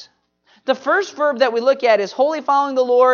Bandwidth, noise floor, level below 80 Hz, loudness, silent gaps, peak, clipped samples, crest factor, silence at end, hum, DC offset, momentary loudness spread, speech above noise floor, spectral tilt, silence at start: 7 kHz; -58 dBFS; -80 dBFS; -17 LUFS; none; -2 dBFS; under 0.1%; 14 dB; 0 s; none; under 0.1%; 6 LU; 42 dB; -3.5 dB/octave; 0 s